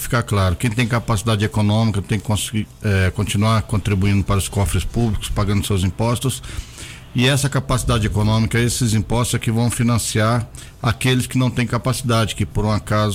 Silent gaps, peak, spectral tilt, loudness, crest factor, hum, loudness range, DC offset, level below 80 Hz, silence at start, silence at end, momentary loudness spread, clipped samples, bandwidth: none; -6 dBFS; -5 dB/octave; -19 LUFS; 14 dB; none; 2 LU; under 0.1%; -32 dBFS; 0 s; 0 s; 5 LU; under 0.1%; 16 kHz